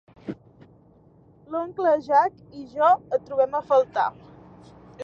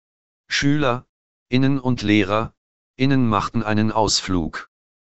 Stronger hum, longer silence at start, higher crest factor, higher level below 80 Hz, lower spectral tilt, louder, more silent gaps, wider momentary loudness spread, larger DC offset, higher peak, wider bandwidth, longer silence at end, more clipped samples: neither; second, 0.25 s vs 0.45 s; about the same, 18 dB vs 18 dB; second, -64 dBFS vs -44 dBFS; first, -6.5 dB/octave vs -5 dB/octave; second, -23 LUFS vs -20 LUFS; second, none vs 1.09-1.46 s, 2.57-2.94 s; first, 19 LU vs 7 LU; second, under 0.1% vs 3%; second, -8 dBFS vs -2 dBFS; second, 7 kHz vs 8.4 kHz; second, 0 s vs 0.45 s; neither